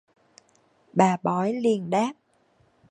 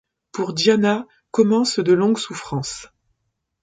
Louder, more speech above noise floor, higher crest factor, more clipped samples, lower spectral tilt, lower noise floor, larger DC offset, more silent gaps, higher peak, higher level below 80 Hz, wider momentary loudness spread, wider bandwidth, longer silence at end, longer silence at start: second, -24 LUFS vs -19 LUFS; second, 41 dB vs 56 dB; about the same, 22 dB vs 18 dB; neither; first, -6.5 dB/octave vs -5 dB/octave; second, -64 dBFS vs -75 dBFS; neither; neither; about the same, -4 dBFS vs -2 dBFS; second, -72 dBFS vs -60 dBFS; second, 6 LU vs 12 LU; first, 10.5 kHz vs 9.4 kHz; about the same, 0.8 s vs 0.8 s; first, 0.95 s vs 0.35 s